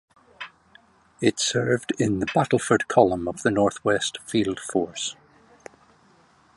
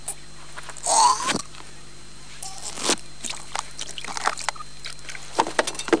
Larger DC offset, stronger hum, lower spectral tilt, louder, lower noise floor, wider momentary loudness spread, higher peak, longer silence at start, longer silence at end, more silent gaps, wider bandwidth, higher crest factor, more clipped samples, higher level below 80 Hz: second, under 0.1% vs 2%; second, none vs 50 Hz at -55 dBFS; first, -4.5 dB/octave vs -1.5 dB/octave; about the same, -23 LUFS vs -25 LUFS; first, -58 dBFS vs -45 dBFS; second, 11 LU vs 22 LU; about the same, -2 dBFS vs -2 dBFS; first, 0.4 s vs 0 s; first, 1.45 s vs 0 s; neither; about the same, 11.5 kHz vs 10.5 kHz; about the same, 22 dB vs 24 dB; neither; about the same, -56 dBFS vs -54 dBFS